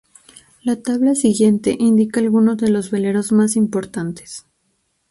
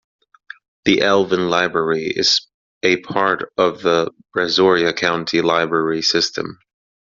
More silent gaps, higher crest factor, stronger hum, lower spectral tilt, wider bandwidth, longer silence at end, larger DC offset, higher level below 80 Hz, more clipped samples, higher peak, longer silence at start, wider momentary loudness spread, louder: second, none vs 2.54-2.81 s; about the same, 14 dB vs 18 dB; neither; first, -6 dB/octave vs -2 dB/octave; first, 11.5 kHz vs 7.6 kHz; first, 0.7 s vs 0.55 s; neither; about the same, -58 dBFS vs -58 dBFS; neither; second, -4 dBFS vs 0 dBFS; second, 0.65 s vs 0.85 s; first, 11 LU vs 6 LU; about the same, -17 LUFS vs -17 LUFS